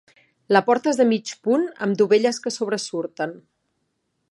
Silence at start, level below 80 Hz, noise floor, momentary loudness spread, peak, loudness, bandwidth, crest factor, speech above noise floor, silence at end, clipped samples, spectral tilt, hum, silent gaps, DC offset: 0.5 s; -76 dBFS; -73 dBFS; 11 LU; -2 dBFS; -21 LUFS; 11.5 kHz; 22 dB; 53 dB; 0.9 s; under 0.1%; -4.5 dB/octave; none; none; under 0.1%